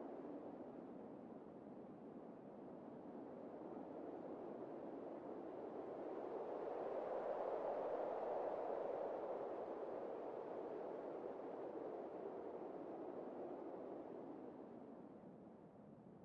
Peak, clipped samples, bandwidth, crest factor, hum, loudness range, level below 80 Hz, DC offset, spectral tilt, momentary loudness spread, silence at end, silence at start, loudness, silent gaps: -32 dBFS; under 0.1%; 7.2 kHz; 16 dB; none; 9 LU; -88 dBFS; under 0.1%; -6.5 dB/octave; 12 LU; 0 s; 0 s; -50 LUFS; none